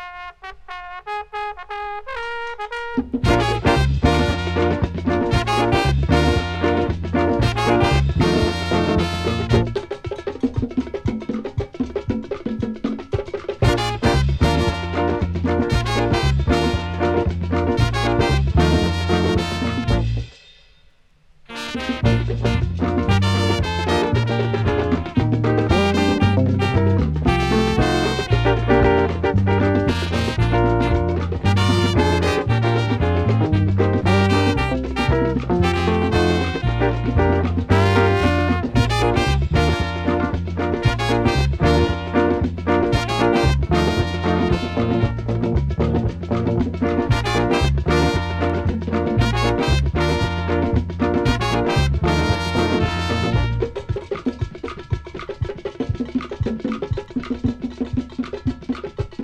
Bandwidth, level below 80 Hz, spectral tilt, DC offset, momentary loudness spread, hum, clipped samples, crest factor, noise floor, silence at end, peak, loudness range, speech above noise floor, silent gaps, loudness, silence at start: 13 kHz; -28 dBFS; -6.5 dB/octave; under 0.1%; 10 LU; none; under 0.1%; 18 dB; -53 dBFS; 0 s; -2 dBFS; 6 LU; 36 dB; none; -20 LUFS; 0 s